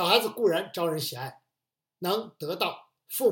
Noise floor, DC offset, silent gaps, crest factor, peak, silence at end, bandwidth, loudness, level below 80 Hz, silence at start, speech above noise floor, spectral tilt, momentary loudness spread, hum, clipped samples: -88 dBFS; under 0.1%; none; 24 dB; -6 dBFS; 0 s; 17 kHz; -29 LUFS; -84 dBFS; 0 s; 60 dB; -3.5 dB/octave; 13 LU; none; under 0.1%